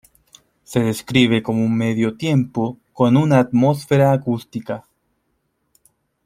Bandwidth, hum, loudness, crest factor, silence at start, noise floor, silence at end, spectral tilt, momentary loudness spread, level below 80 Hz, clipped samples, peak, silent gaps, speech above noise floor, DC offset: 15.5 kHz; none; -18 LUFS; 18 dB; 0.7 s; -69 dBFS; 1.45 s; -7 dB/octave; 11 LU; -56 dBFS; under 0.1%; -2 dBFS; none; 52 dB; under 0.1%